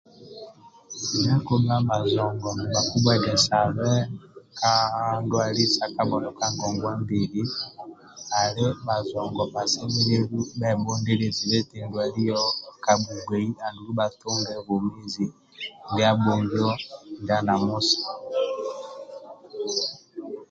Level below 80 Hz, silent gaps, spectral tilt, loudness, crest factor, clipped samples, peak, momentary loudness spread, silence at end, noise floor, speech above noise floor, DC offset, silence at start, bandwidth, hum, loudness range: -54 dBFS; none; -4.5 dB/octave; -25 LUFS; 20 dB; under 0.1%; -6 dBFS; 16 LU; 0.05 s; -46 dBFS; 22 dB; under 0.1%; 0.2 s; 8.8 kHz; none; 4 LU